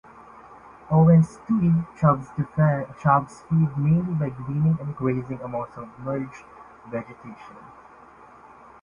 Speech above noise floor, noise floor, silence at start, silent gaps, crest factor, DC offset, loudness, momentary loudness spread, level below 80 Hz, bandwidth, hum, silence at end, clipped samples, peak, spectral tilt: 26 dB; -48 dBFS; 0.5 s; none; 18 dB; under 0.1%; -23 LUFS; 18 LU; -52 dBFS; 7.2 kHz; none; 1.15 s; under 0.1%; -6 dBFS; -10.5 dB/octave